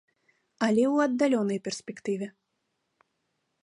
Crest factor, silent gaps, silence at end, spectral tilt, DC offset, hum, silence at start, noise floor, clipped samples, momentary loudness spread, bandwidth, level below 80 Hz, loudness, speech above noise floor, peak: 18 dB; none; 1.35 s; -5.5 dB/octave; under 0.1%; none; 0.6 s; -79 dBFS; under 0.1%; 11 LU; 11.5 kHz; -76 dBFS; -27 LUFS; 52 dB; -12 dBFS